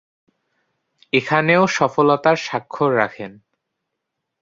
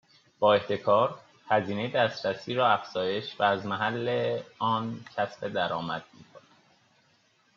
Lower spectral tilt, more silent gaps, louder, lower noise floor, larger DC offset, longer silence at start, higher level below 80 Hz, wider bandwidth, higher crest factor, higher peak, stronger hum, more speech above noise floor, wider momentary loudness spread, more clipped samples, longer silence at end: first, -5.5 dB/octave vs -3 dB/octave; neither; first, -18 LUFS vs -28 LUFS; first, -79 dBFS vs -66 dBFS; neither; first, 1.15 s vs 0.4 s; first, -62 dBFS vs -74 dBFS; about the same, 7.8 kHz vs 7.2 kHz; about the same, 18 dB vs 20 dB; first, -2 dBFS vs -8 dBFS; neither; first, 61 dB vs 39 dB; about the same, 10 LU vs 8 LU; neither; about the same, 1.1 s vs 1.2 s